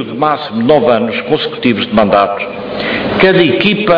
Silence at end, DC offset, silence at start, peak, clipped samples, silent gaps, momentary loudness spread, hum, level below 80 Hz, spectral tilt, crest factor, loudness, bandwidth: 0 s; under 0.1%; 0 s; 0 dBFS; 0.1%; none; 7 LU; none; -42 dBFS; -8 dB/octave; 12 dB; -12 LUFS; 5.2 kHz